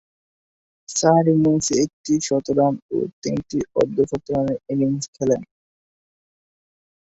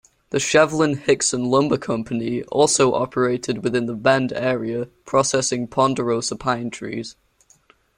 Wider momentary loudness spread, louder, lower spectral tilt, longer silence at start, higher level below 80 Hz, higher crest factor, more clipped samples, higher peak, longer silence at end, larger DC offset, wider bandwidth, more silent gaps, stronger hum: about the same, 9 LU vs 10 LU; about the same, -21 LUFS vs -20 LUFS; first, -5.5 dB/octave vs -4 dB/octave; first, 0.9 s vs 0.35 s; about the same, -54 dBFS vs -56 dBFS; about the same, 20 dB vs 18 dB; neither; about the same, -2 dBFS vs -2 dBFS; first, 1.75 s vs 0.85 s; neither; second, 8.2 kHz vs 16 kHz; first, 1.93-2.04 s, 2.82-2.89 s, 3.13-3.22 s, 5.08-5.13 s vs none; neither